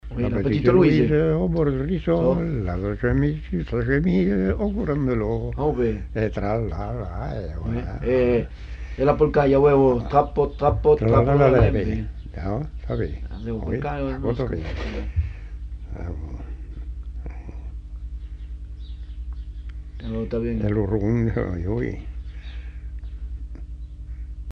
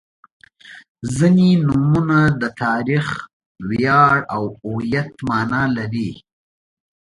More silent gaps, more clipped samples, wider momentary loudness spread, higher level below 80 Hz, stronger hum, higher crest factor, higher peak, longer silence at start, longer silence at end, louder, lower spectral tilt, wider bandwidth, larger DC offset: second, none vs 0.89-0.95 s, 3.33-3.40 s, 3.46-3.55 s; neither; first, 20 LU vs 13 LU; first, -32 dBFS vs -48 dBFS; first, 50 Hz at -35 dBFS vs none; about the same, 18 dB vs 18 dB; about the same, -4 dBFS vs -2 dBFS; second, 0.05 s vs 0.7 s; second, 0 s vs 0.85 s; second, -22 LUFS vs -18 LUFS; first, -9.5 dB/octave vs -7 dB/octave; second, 6.6 kHz vs 11.5 kHz; neither